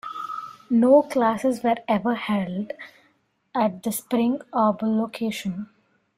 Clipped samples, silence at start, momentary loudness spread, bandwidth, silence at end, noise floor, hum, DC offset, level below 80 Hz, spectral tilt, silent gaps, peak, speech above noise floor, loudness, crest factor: under 0.1%; 0.05 s; 17 LU; 15.5 kHz; 0.5 s; -65 dBFS; none; under 0.1%; -66 dBFS; -6 dB/octave; none; -6 dBFS; 43 dB; -23 LUFS; 18 dB